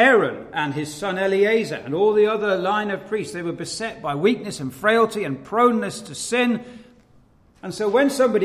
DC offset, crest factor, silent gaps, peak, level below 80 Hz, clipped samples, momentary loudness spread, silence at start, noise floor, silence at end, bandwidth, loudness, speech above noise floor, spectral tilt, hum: under 0.1%; 18 dB; none; -4 dBFS; -60 dBFS; under 0.1%; 10 LU; 0 s; -54 dBFS; 0 s; 15 kHz; -21 LUFS; 34 dB; -4.5 dB/octave; none